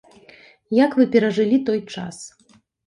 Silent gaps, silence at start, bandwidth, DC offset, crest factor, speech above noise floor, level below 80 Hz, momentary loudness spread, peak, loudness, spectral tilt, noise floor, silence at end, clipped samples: none; 0.7 s; 11 kHz; under 0.1%; 18 dB; 31 dB; -66 dBFS; 18 LU; -4 dBFS; -19 LUFS; -6 dB/octave; -49 dBFS; 0.6 s; under 0.1%